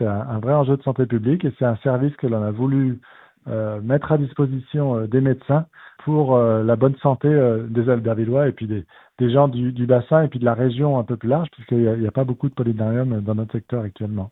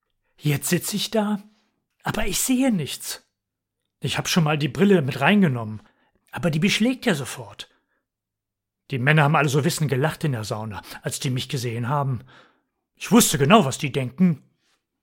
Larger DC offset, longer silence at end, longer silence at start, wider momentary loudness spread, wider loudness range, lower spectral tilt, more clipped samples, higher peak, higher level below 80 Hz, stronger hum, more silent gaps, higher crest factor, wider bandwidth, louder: neither; second, 0.05 s vs 0.65 s; second, 0 s vs 0.45 s; second, 9 LU vs 16 LU; about the same, 3 LU vs 5 LU; first, -12 dB/octave vs -5 dB/octave; neither; about the same, -2 dBFS vs -2 dBFS; second, -56 dBFS vs -48 dBFS; neither; neither; about the same, 18 dB vs 22 dB; second, 4 kHz vs 17 kHz; about the same, -20 LUFS vs -22 LUFS